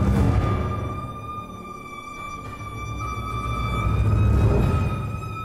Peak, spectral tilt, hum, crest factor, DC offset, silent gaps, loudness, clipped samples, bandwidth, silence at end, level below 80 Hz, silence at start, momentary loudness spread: -8 dBFS; -7.5 dB/octave; none; 16 dB; under 0.1%; none; -25 LUFS; under 0.1%; 13.5 kHz; 0 s; -28 dBFS; 0 s; 15 LU